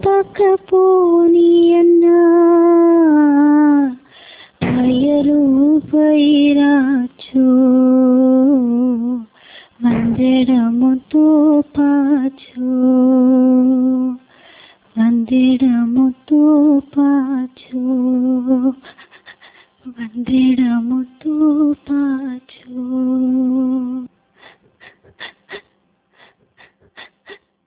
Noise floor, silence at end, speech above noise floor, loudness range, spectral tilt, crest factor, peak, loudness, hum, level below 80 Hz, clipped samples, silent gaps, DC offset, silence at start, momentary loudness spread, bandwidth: -61 dBFS; 0.3 s; 50 dB; 9 LU; -11 dB/octave; 10 dB; -4 dBFS; -13 LUFS; none; -52 dBFS; under 0.1%; none; under 0.1%; 0.05 s; 13 LU; 4 kHz